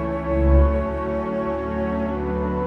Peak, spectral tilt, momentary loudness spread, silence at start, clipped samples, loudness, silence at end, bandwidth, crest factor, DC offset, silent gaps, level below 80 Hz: -6 dBFS; -10.5 dB/octave; 7 LU; 0 s; under 0.1%; -22 LUFS; 0 s; 4.1 kHz; 16 dB; under 0.1%; none; -26 dBFS